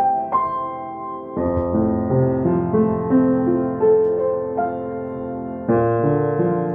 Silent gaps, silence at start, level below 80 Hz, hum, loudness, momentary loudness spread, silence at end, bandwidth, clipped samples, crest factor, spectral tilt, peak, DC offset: none; 0 s; -44 dBFS; none; -20 LUFS; 11 LU; 0 s; 3.4 kHz; under 0.1%; 14 dB; -13 dB/octave; -6 dBFS; under 0.1%